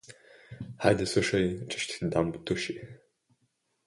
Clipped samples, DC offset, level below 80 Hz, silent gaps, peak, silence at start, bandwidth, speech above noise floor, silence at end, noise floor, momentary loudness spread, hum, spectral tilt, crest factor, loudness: under 0.1%; under 0.1%; -54 dBFS; none; -8 dBFS; 0.1 s; 11.5 kHz; 46 dB; 0.9 s; -75 dBFS; 17 LU; none; -5 dB/octave; 24 dB; -29 LUFS